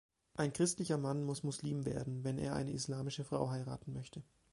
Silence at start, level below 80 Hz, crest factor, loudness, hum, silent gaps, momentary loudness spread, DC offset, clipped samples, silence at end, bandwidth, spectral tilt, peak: 0.35 s; -64 dBFS; 18 dB; -39 LUFS; none; none; 12 LU; under 0.1%; under 0.1%; 0.3 s; 11.5 kHz; -5.5 dB/octave; -20 dBFS